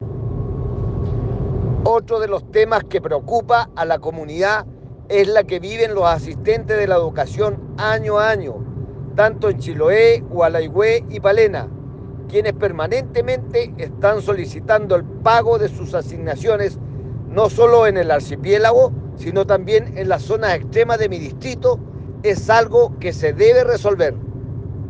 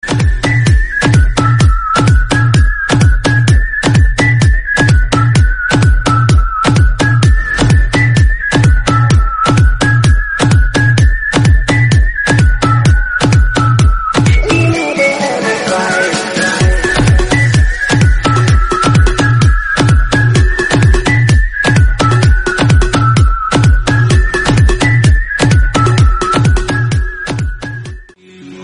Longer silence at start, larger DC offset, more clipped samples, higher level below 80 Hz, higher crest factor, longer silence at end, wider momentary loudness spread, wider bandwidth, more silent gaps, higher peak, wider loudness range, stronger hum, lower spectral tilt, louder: about the same, 0 s vs 0.05 s; neither; neither; second, -38 dBFS vs -14 dBFS; first, 16 dB vs 8 dB; about the same, 0 s vs 0 s; first, 12 LU vs 2 LU; second, 8.4 kHz vs 11 kHz; neither; about the same, 0 dBFS vs 0 dBFS; about the same, 3 LU vs 1 LU; neither; about the same, -6.5 dB/octave vs -5.5 dB/octave; second, -17 LUFS vs -10 LUFS